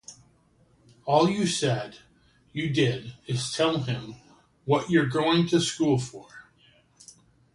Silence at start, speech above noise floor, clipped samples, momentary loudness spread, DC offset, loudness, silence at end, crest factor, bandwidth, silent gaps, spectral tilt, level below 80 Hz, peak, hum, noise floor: 0.1 s; 37 dB; under 0.1%; 16 LU; under 0.1%; -25 LUFS; 1.15 s; 20 dB; 11.5 kHz; none; -5 dB/octave; -60 dBFS; -8 dBFS; none; -62 dBFS